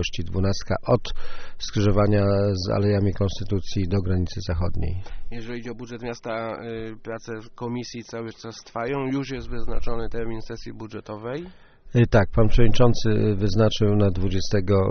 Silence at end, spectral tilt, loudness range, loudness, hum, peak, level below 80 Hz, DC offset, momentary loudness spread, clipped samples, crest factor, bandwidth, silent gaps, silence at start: 0 s; -6.5 dB/octave; 11 LU; -25 LUFS; none; -2 dBFS; -32 dBFS; under 0.1%; 15 LU; under 0.1%; 20 dB; 6.6 kHz; none; 0 s